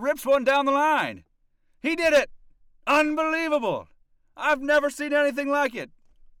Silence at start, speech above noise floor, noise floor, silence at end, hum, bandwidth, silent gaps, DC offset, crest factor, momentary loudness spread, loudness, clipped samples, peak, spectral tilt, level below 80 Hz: 0 s; 42 dB; -65 dBFS; 0.55 s; none; 17 kHz; none; under 0.1%; 12 dB; 11 LU; -23 LUFS; under 0.1%; -12 dBFS; -3.5 dB/octave; -58 dBFS